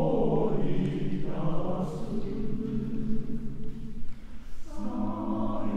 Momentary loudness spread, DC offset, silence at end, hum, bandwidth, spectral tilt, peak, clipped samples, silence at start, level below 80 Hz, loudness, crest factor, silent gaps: 17 LU; under 0.1%; 0 s; none; 5 kHz; -9 dB/octave; -14 dBFS; under 0.1%; 0 s; -38 dBFS; -32 LUFS; 12 dB; none